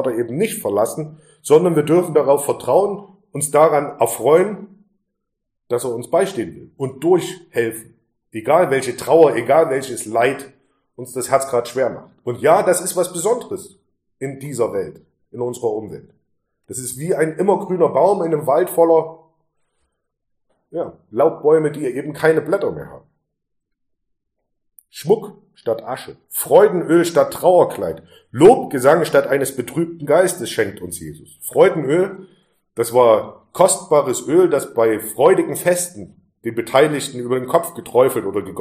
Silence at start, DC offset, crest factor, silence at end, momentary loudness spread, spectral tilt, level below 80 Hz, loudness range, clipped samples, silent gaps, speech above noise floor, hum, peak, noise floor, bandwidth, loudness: 0 s; under 0.1%; 18 dB; 0 s; 16 LU; -5 dB/octave; -60 dBFS; 8 LU; under 0.1%; none; 59 dB; none; 0 dBFS; -76 dBFS; 15.5 kHz; -17 LUFS